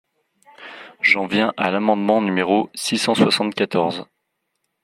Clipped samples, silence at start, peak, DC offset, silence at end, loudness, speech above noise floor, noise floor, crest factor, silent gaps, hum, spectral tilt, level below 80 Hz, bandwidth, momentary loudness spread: under 0.1%; 0.6 s; -2 dBFS; under 0.1%; 0.8 s; -19 LUFS; 56 dB; -75 dBFS; 18 dB; none; none; -4.5 dB/octave; -66 dBFS; 15.5 kHz; 12 LU